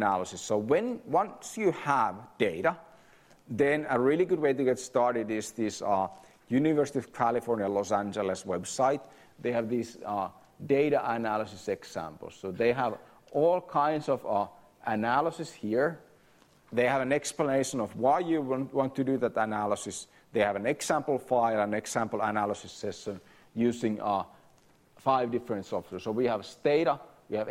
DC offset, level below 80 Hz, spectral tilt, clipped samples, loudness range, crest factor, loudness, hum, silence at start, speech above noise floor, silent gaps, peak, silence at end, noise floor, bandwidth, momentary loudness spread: under 0.1%; -68 dBFS; -5 dB/octave; under 0.1%; 3 LU; 18 dB; -30 LUFS; none; 0 s; 33 dB; none; -12 dBFS; 0 s; -62 dBFS; 16 kHz; 10 LU